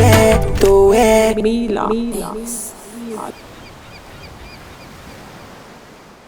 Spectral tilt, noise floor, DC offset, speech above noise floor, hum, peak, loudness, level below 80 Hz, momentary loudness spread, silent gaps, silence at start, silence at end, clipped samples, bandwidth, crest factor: -5.5 dB/octave; -41 dBFS; under 0.1%; 22 dB; none; 0 dBFS; -14 LUFS; -28 dBFS; 26 LU; none; 0 s; 0.55 s; under 0.1%; over 20 kHz; 16 dB